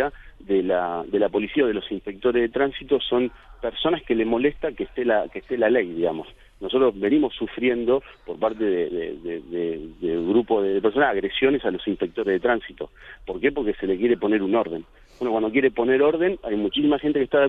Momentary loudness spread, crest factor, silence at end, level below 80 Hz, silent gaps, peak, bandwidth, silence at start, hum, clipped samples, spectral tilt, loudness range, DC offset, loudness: 10 LU; 16 dB; 0 s; -50 dBFS; none; -6 dBFS; 4 kHz; 0 s; none; under 0.1%; -8 dB/octave; 2 LU; under 0.1%; -23 LUFS